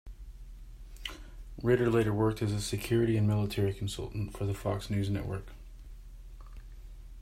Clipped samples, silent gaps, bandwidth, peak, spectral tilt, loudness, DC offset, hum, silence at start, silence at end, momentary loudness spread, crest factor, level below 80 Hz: under 0.1%; none; 15.5 kHz; -14 dBFS; -6.5 dB/octave; -32 LUFS; under 0.1%; none; 0.05 s; 0 s; 24 LU; 18 dB; -46 dBFS